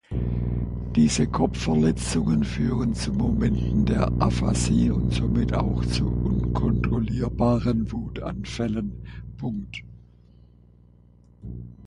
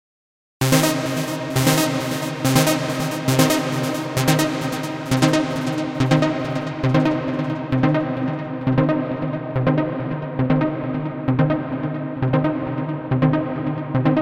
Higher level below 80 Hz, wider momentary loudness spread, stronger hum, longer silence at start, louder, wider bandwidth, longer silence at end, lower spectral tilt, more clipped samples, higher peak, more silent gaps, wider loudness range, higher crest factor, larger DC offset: first, -32 dBFS vs -48 dBFS; first, 12 LU vs 8 LU; first, 60 Hz at -25 dBFS vs none; second, 0.1 s vs 0.6 s; second, -24 LUFS vs -21 LUFS; second, 11.5 kHz vs 16.5 kHz; about the same, 0 s vs 0 s; about the same, -6.5 dB/octave vs -5.5 dB/octave; neither; second, -6 dBFS vs -2 dBFS; neither; first, 10 LU vs 3 LU; about the same, 18 dB vs 20 dB; neither